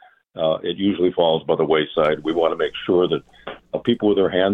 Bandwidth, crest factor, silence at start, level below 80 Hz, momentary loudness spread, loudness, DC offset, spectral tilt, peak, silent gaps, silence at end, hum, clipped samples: 4.3 kHz; 16 dB; 0.35 s; -54 dBFS; 9 LU; -20 LUFS; under 0.1%; -8 dB/octave; -4 dBFS; none; 0 s; none; under 0.1%